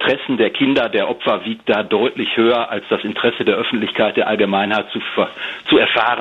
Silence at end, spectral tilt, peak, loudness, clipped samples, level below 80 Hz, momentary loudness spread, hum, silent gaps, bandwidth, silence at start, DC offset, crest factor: 0 s; -6.5 dB/octave; -2 dBFS; -17 LUFS; under 0.1%; -56 dBFS; 6 LU; none; none; 7.6 kHz; 0 s; under 0.1%; 16 dB